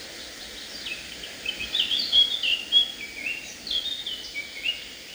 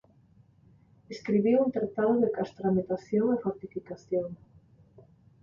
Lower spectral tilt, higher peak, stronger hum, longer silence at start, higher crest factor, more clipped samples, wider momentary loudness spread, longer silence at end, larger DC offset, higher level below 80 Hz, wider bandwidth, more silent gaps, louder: second, 0.5 dB/octave vs -8.5 dB/octave; first, -8 dBFS vs -14 dBFS; neither; second, 0 s vs 1.1 s; about the same, 20 dB vs 16 dB; neither; about the same, 17 LU vs 15 LU; second, 0 s vs 1.05 s; neither; first, -58 dBFS vs -66 dBFS; first, over 20 kHz vs 7.4 kHz; neither; first, -24 LUFS vs -28 LUFS